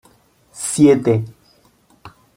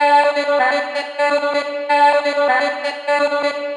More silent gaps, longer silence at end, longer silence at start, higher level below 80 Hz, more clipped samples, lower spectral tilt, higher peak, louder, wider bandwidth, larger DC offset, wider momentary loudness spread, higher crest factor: neither; first, 0.3 s vs 0 s; first, 0.55 s vs 0 s; first, -56 dBFS vs -90 dBFS; neither; first, -6 dB/octave vs -1.5 dB/octave; about the same, -2 dBFS vs -2 dBFS; about the same, -16 LUFS vs -17 LUFS; first, 16 kHz vs 10 kHz; neither; first, 15 LU vs 7 LU; about the same, 18 dB vs 14 dB